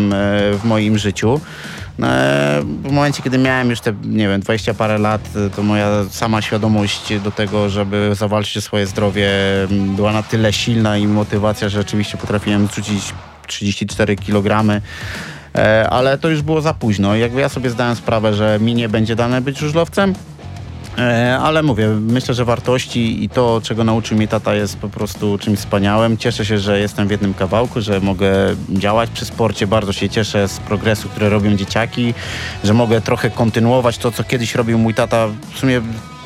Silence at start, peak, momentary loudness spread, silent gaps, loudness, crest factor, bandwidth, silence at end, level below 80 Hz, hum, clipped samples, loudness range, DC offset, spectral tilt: 0 s; -2 dBFS; 6 LU; none; -16 LUFS; 14 dB; 14.5 kHz; 0 s; -42 dBFS; none; under 0.1%; 1 LU; under 0.1%; -6 dB/octave